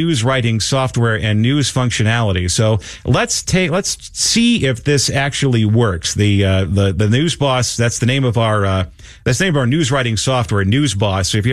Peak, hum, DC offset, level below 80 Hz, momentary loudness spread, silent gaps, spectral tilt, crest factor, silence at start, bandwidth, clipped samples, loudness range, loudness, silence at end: -2 dBFS; none; under 0.1%; -38 dBFS; 3 LU; none; -4.5 dB/octave; 14 dB; 0 s; 13.5 kHz; under 0.1%; 1 LU; -15 LUFS; 0 s